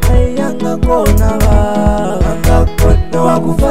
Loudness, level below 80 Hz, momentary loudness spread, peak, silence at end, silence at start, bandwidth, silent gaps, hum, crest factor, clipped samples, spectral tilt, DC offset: -12 LUFS; -14 dBFS; 4 LU; 0 dBFS; 0 s; 0 s; 16 kHz; none; none; 10 dB; 0.2%; -7 dB/octave; 10%